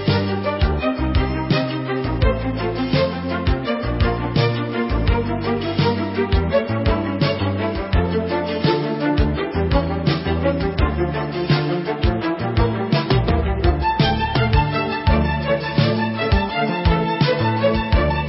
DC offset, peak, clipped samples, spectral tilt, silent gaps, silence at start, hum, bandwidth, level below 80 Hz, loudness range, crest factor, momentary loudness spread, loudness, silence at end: under 0.1%; -4 dBFS; under 0.1%; -11 dB/octave; none; 0 s; none; 5.8 kHz; -26 dBFS; 2 LU; 16 dB; 4 LU; -20 LUFS; 0 s